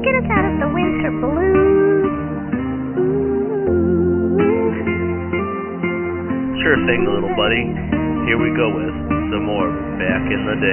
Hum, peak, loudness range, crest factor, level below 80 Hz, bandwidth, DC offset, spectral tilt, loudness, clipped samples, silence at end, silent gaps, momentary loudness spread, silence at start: none; -2 dBFS; 2 LU; 16 dB; -36 dBFS; 3.2 kHz; under 0.1%; -4 dB/octave; -18 LUFS; under 0.1%; 0 s; none; 7 LU; 0 s